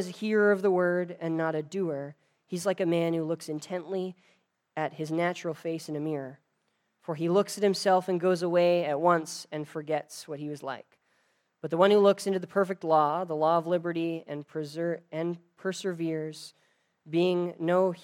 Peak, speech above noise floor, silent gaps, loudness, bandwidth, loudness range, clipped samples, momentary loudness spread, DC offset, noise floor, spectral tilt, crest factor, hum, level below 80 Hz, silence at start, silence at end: -8 dBFS; 48 dB; none; -29 LUFS; 16.5 kHz; 7 LU; under 0.1%; 14 LU; under 0.1%; -76 dBFS; -6 dB/octave; 22 dB; none; -86 dBFS; 0 s; 0.05 s